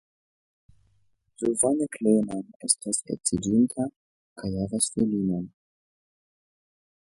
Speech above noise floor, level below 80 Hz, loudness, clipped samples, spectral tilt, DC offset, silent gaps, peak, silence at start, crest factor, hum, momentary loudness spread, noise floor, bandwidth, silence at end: 43 dB; -56 dBFS; -26 LUFS; under 0.1%; -4.5 dB/octave; under 0.1%; 2.56-2.60 s, 3.96-4.36 s; -6 dBFS; 1.4 s; 24 dB; none; 10 LU; -69 dBFS; 11.5 kHz; 1.55 s